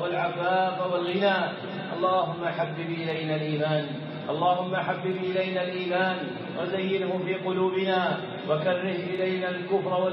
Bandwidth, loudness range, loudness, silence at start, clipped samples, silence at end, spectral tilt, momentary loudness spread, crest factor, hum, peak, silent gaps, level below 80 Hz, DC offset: 5.8 kHz; 1 LU; -27 LUFS; 0 s; under 0.1%; 0 s; -4 dB/octave; 6 LU; 16 dB; none; -12 dBFS; none; -78 dBFS; under 0.1%